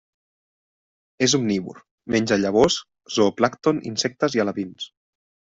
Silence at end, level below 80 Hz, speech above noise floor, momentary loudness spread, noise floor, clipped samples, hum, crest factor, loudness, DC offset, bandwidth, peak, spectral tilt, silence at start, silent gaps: 0.75 s; -56 dBFS; over 69 dB; 14 LU; under -90 dBFS; under 0.1%; none; 20 dB; -22 LUFS; under 0.1%; 8 kHz; -4 dBFS; -4 dB/octave; 1.2 s; 1.91-1.98 s